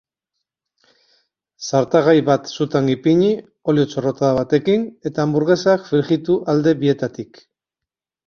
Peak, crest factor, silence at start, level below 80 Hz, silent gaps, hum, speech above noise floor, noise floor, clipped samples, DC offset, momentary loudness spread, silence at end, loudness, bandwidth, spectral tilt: -2 dBFS; 18 dB; 1.6 s; -56 dBFS; none; none; 69 dB; -86 dBFS; under 0.1%; under 0.1%; 8 LU; 1.05 s; -18 LUFS; 7 kHz; -6.5 dB/octave